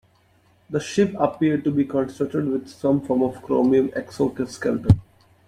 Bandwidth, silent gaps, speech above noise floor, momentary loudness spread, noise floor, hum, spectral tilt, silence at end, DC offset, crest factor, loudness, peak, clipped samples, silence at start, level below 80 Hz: 12 kHz; none; 38 dB; 7 LU; -59 dBFS; none; -7.5 dB/octave; 0.45 s; under 0.1%; 20 dB; -22 LUFS; -2 dBFS; under 0.1%; 0.7 s; -44 dBFS